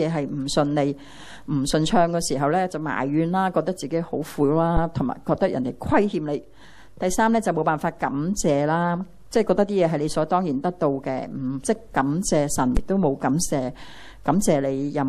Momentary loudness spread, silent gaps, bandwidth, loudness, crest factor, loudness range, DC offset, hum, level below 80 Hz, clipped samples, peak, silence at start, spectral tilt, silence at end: 8 LU; none; 14.5 kHz; -23 LUFS; 18 dB; 1 LU; under 0.1%; none; -40 dBFS; under 0.1%; -4 dBFS; 0 s; -5.5 dB/octave; 0 s